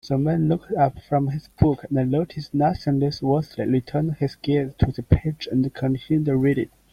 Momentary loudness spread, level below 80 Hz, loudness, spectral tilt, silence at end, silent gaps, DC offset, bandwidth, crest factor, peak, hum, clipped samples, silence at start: 4 LU; -40 dBFS; -23 LUFS; -9 dB/octave; 0.25 s; none; under 0.1%; 9.6 kHz; 20 dB; -2 dBFS; none; under 0.1%; 0.05 s